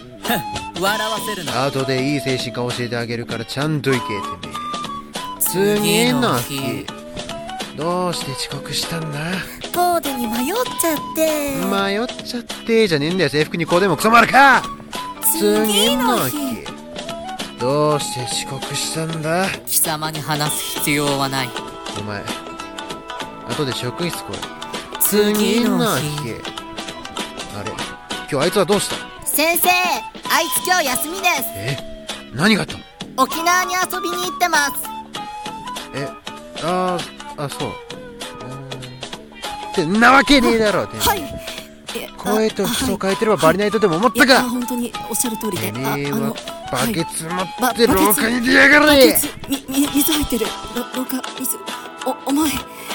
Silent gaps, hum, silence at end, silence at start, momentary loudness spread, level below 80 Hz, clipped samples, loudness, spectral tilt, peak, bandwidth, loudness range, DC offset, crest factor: none; none; 0 s; 0 s; 15 LU; -44 dBFS; under 0.1%; -18 LUFS; -3.5 dB/octave; 0 dBFS; 19 kHz; 8 LU; under 0.1%; 20 dB